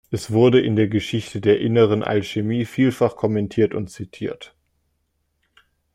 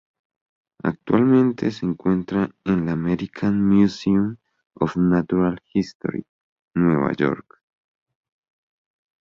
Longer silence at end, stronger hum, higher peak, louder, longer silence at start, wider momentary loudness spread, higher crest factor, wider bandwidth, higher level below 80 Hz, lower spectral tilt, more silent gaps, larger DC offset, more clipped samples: second, 1.5 s vs 1.8 s; neither; about the same, -4 dBFS vs -4 dBFS; about the same, -20 LUFS vs -21 LUFS; second, 0.1 s vs 0.85 s; first, 14 LU vs 11 LU; about the same, 16 dB vs 18 dB; first, 15 kHz vs 7.2 kHz; about the same, -56 dBFS vs -52 dBFS; second, -7 dB/octave vs -8.5 dB/octave; second, none vs 5.95-6.00 s, 6.29-6.68 s; neither; neither